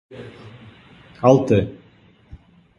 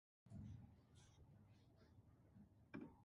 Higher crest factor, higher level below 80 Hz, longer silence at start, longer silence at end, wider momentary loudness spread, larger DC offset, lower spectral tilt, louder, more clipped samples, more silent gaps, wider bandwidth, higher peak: about the same, 22 dB vs 22 dB; first, -48 dBFS vs -74 dBFS; second, 0.1 s vs 0.25 s; first, 1.05 s vs 0 s; first, 25 LU vs 10 LU; neither; about the same, -8 dB/octave vs -7 dB/octave; first, -18 LUFS vs -62 LUFS; neither; neither; about the same, 11 kHz vs 10.5 kHz; first, 0 dBFS vs -42 dBFS